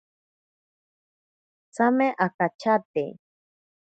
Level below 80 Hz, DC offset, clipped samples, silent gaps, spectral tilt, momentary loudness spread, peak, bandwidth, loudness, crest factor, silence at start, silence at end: -78 dBFS; under 0.1%; under 0.1%; 2.34-2.39 s, 2.55-2.59 s, 2.85-2.94 s; -7 dB/octave; 11 LU; -6 dBFS; 9 kHz; -24 LUFS; 22 dB; 1.8 s; 0.85 s